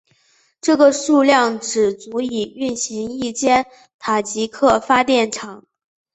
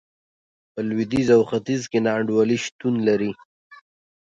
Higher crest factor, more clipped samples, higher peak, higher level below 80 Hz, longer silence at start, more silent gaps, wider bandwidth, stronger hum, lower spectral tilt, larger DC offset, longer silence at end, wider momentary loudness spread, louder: about the same, 18 dB vs 18 dB; neither; about the same, -2 dBFS vs -4 dBFS; about the same, -54 dBFS vs -58 dBFS; about the same, 0.65 s vs 0.75 s; second, 3.94-3.99 s vs 2.72-2.79 s, 3.45-3.70 s; about the same, 8.4 kHz vs 8.8 kHz; neither; second, -3 dB/octave vs -6 dB/octave; neither; about the same, 0.55 s vs 0.45 s; about the same, 11 LU vs 12 LU; first, -17 LUFS vs -21 LUFS